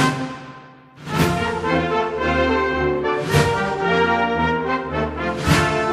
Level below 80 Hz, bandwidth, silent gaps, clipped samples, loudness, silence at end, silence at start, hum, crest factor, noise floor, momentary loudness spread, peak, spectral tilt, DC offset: -40 dBFS; 15.5 kHz; none; under 0.1%; -20 LUFS; 0 s; 0 s; none; 18 dB; -42 dBFS; 8 LU; -2 dBFS; -5.5 dB/octave; under 0.1%